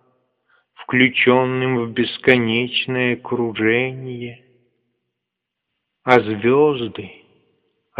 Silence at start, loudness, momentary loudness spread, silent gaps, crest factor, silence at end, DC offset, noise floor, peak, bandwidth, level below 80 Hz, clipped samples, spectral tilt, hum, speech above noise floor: 0.8 s; -18 LUFS; 15 LU; none; 20 dB; 0.9 s; under 0.1%; -81 dBFS; 0 dBFS; 6.4 kHz; -62 dBFS; under 0.1%; -3.5 dB/octave; none; 63 dB